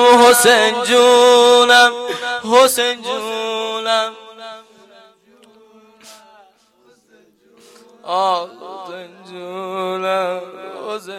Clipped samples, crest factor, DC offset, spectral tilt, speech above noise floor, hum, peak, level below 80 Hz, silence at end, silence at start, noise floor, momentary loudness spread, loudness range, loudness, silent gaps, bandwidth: under 0.1%; 16 dB; under 0.1%; -1 dB/octave; 39 dB; none; 0 dBFS; -64 dBFS; 0 s; 0 s; -54 dBFS; 24 LU; 14 LU; -13 LUFS; none; 16 kHz